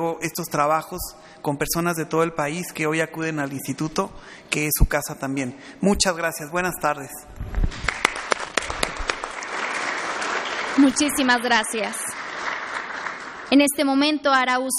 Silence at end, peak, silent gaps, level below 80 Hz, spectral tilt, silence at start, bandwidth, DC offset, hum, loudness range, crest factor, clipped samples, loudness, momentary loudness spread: 0 s; 0 dBFS; none; -34 dBFS; -3.5 dB/octave; 0 s; 15 kHz; under 0.1%; none; 4 LU; 24 dB; under 0.1%; -23 LUFS; 12 LU